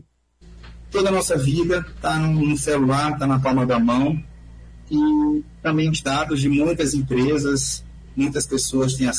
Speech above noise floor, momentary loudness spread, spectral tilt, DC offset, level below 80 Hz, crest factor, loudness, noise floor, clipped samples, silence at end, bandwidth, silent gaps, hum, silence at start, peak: 31 dB; 6 LU; -5.5 dB/octave; under 0.1%; -40 dBFS; 12 dB; -20 LUFS; -50 dBFS; under 0.1%; 0 s; 11 kHz; none; none; 0.45 s; -8 dBFS